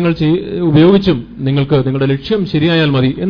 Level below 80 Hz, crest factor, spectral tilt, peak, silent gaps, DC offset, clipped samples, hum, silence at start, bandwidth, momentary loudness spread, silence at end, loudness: -38 dBFS; 12 dB; -9 dB/octave; 0 dBFS; none; under 0.1%; 0.1%; none; 0 s; 5.4 kHz; 7 LU; 0 s; -13 LUFS